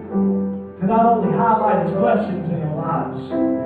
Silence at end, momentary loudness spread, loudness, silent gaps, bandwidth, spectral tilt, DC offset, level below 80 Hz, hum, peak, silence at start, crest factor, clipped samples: 0 s; 8 LU; -19 LUFS; none; 4.5 kHz; -11 dB/octave; under 0.1%; -56 dBFS; none; -6 dBFS; 0 s; 14 dB; under 0.1%